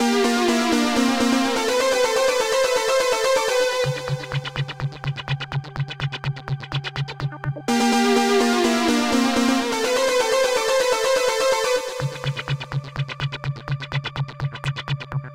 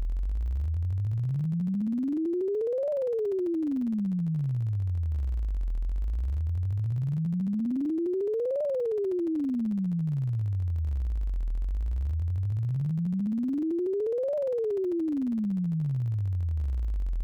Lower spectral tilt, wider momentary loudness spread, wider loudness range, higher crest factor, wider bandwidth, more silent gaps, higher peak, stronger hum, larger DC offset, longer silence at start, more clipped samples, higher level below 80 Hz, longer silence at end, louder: second, -4.5 dB/octave vs -11.5 dB/octave; first, 10 LU vs 3 LU; first, 8 LU vs 2 LU; first, 14 dB vs 4 dB; first, 16.5 kHz vs 5.4 kHz; neither; first, -8 dBFS vs -26 dBFS; neither; neither; about the same, 0 s vs 0 s; neither; second, -50 dBFS vs -34 dBFS; about the same, 0 s vs 0 s; first, -21 LUFS vs -30 LUFS